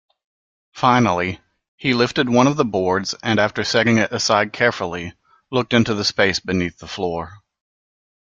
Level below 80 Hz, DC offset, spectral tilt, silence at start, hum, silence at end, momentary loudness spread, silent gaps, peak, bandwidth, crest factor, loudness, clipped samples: -54 dBFS; under 0.1%; -4.5 dB/octave; 0.75 s; none; 1 s; 10 LU; 1.68-1.78 s; -2 dBFS; 7.8 kHz; 18 dB; -19 LUFS; under 0.1%